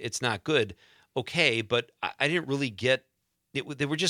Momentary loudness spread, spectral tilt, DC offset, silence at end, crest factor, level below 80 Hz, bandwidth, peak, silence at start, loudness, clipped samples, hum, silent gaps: 11 LU; -4 dB/octave; under 0.1%; 0 s; 22 dB; -68 dBFS; 15.5 kHz; -8 dBFS; 0 s; -28 LUFS; under 0.1%; none; none